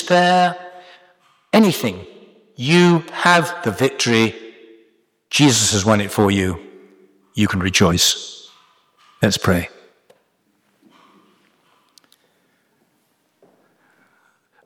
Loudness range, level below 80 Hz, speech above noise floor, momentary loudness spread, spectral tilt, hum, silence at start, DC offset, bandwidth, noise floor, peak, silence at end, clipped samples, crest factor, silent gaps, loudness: 8 LU; -52 dBFS; 49 dB; 19 LU; -4 dB/octave; none; 0 s; under 0.1%; 19 kHz; -65 dBFS; -2 dBFS; 5 s; under 0.1%; 18 dB; none; -16 LUFS